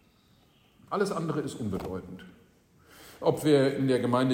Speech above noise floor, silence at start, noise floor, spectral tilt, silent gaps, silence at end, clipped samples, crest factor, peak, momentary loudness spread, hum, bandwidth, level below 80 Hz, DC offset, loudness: 35 dB; 0.9 s; -63 dBFS; -6.5 dB/octave; none; 0 s; under 0.1%; 20 dB; -10 dBFS; 15 LU; none; 16 kHz; -60 dBFS; under 0.1%; -28 LUFS